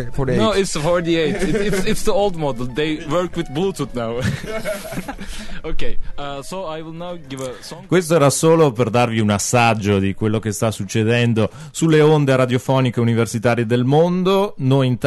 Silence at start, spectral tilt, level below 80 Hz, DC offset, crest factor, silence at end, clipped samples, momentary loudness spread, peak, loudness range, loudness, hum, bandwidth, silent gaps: 0 s; -5.5 dB/octave; -34 dBFS; under 0.1%; 14 dB; 0 s; under 0.1%; 15 LU; -4 dBFS; 10 LU; -18 LUFS; none; 12.5 kHz; none